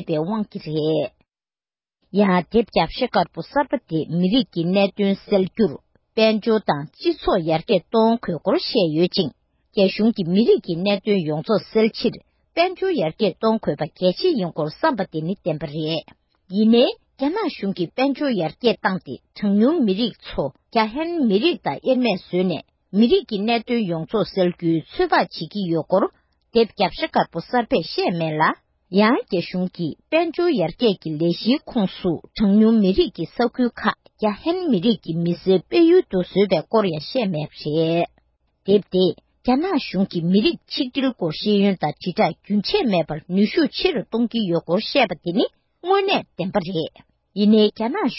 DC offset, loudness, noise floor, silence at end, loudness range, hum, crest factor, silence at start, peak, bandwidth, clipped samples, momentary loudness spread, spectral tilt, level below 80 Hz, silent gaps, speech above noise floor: under 0.1%; -21 LUFS; under -90 dBFS; 0 s; 2 LU; none; 16 dB; 0 s; -4 dBFS; 5.8 kHz; under 0.1%; 8 LU; -10.5 dB/octave; -52 dBFS; none; over 70 dB